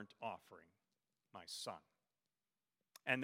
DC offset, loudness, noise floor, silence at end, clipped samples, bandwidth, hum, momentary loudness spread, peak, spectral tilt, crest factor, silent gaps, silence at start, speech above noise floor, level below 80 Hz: under 0.1%; -49 LUFS; under -90 dBFS; 0 s; under 0.1%; 16 kHz; none; 18 LU; -22 dBFS; -3.5 dB/octave; 30 dB; none; 0 s; over 37 dB; under -90 dBFS